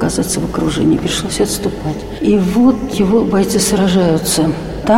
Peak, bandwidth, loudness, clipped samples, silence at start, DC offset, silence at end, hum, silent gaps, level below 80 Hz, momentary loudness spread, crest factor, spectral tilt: 0 dBFS; 16.5 kHz; -14 LUFS; under 0.1%; 0 s; 0.5%; 0 s; none; none; -32 dBFS; 6 LU; 12 dB; -5 dB/octave